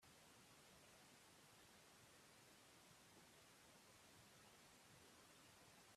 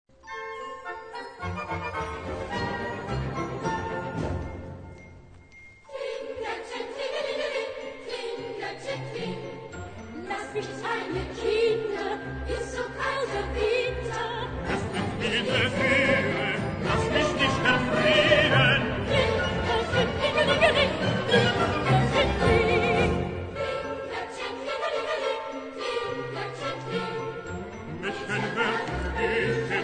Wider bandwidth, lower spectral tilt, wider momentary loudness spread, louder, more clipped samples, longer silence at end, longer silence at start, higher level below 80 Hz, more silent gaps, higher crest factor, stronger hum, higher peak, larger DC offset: first, 14.5 kHz vs 9.4 kHz; second, -2.5 dB/octave vs -5 dB/octave; second, 1 LU vs 14 LU; second, -67 LUFS vs -27 LUFS; neither; about the same, 0 s vs 0 s; second, 0 s vs 0.25 s; second, -90 dBFS vs -44 dBFS; neither; second, 14 dB vs 20 dB; neither; second, -54 dBFS vs -6 dBFS; neither